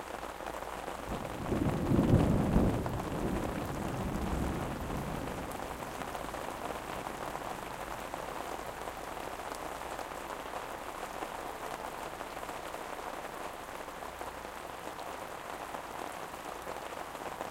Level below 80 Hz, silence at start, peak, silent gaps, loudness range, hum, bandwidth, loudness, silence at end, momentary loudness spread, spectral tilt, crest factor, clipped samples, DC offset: -46 dBFS; 0 s; -14 dBFS; none; 10 LU; none; 17 kHz; -37 LUFS; 0 s; 12 LU; -6 dB/octave; 22 dB; under 0.1%; under 0.1%